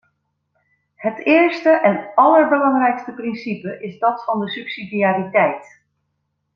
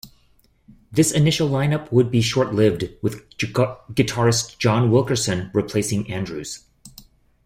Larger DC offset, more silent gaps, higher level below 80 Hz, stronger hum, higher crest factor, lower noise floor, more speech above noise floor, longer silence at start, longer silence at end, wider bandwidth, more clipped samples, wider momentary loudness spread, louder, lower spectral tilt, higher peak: neither; neither; second, -68 dBFS vs -50 dBFS; neither; about the same, 18 dB vs 18 dB; first, -72 dBFS vs -59 dBFS; first, 55 dB vs 39 dB; first, 1 s vs 0.05 s; first, 0.9 s vs 0.55 s; second, 6.4 kHz vs 16 kHz; neither; first, 14 LU vs 10 LU; first, -17 LUFS vs -20 LUFS; first, -7.5 dB/octave vs -5 dB/octave; about the same, -2 dBFS vs -4 dBFS